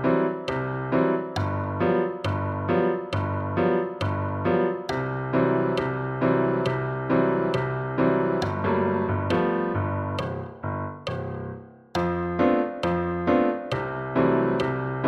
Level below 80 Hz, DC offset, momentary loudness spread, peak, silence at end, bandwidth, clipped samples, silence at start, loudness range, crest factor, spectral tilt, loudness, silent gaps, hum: -52 dBFS; under 0.1%; 8 LU; -8 dBFS; 0 s; 8.8 kHz; under 0.1%; 0 s; 3 LU; 16 dB; -8 dB/octave; -25 LUFS; none; none